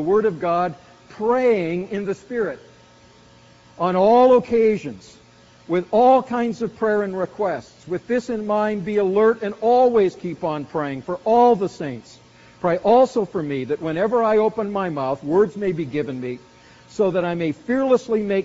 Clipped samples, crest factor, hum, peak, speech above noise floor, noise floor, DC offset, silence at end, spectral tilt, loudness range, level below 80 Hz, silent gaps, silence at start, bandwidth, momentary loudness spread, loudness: under 0.1%; 16 dB; none; -4 dBFS; 30 dB; -50 dBFS; under 0.1%; 0 s; -5.5 dB/octave; 4 LU; -58 dBFS; none; 0 s; 7.6 kHz; 12 LU; -20 LUFS